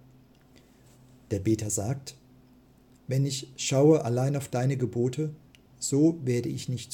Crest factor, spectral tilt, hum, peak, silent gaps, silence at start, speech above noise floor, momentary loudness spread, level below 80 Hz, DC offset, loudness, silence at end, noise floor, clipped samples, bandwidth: 18 dB; -6 dB/octave; none; -10 dBFS; none; 1.3 s; 31 dB; 12 LU; -64 dBFS; under 0.1%; -27 LUFS; 0 s; -58 dBFS; under 0.1%; 17 kHz